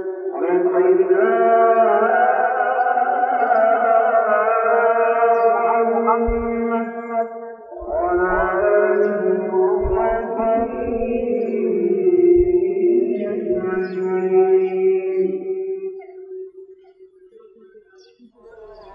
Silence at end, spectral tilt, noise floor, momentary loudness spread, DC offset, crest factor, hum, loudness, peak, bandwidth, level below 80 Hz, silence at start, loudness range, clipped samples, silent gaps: 0 s; -10 dB/octave; -49 dBFS; 10 LU; under 0.1%; 14 dB; none; -18 LUFS; -4 dBFS; 3.2 kHz; -40 dBFS; 0 s; 5 LU; under 0.1%; none